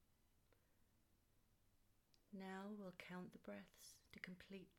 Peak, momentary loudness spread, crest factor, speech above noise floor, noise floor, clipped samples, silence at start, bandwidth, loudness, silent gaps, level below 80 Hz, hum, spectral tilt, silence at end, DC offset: -36 dBFS; 9 LU; 24 dB; 23 dB; -79 dBFS; under 0.1%; 0 s; 16.5 kHz; -57 LUFS; none; -84 dBFS; none; -5 dB/octave; 0 s; under 0.1%